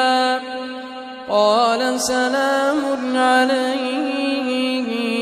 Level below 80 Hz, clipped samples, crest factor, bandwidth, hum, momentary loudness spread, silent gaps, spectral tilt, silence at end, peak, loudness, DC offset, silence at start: -62 dBFS; under 0.1%; 16 dB; 15 kHz; none; 13 LU; none; -2.5 dB/octave; 0 s; -4 dBFS; -19 LUFS; under 0.1%; 0 s